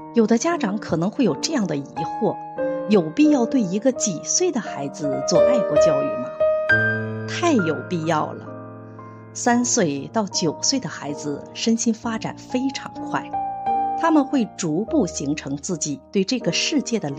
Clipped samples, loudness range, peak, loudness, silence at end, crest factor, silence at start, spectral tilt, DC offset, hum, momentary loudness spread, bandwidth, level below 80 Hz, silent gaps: under 0.1%; 4 LU; -6 dBFS; -21 LUFS; 0 s; 16 dB; 0 s; -4 dB/octave; under 0.1%; none; 11 LU; 9.2 kHz; -56 dBFS; none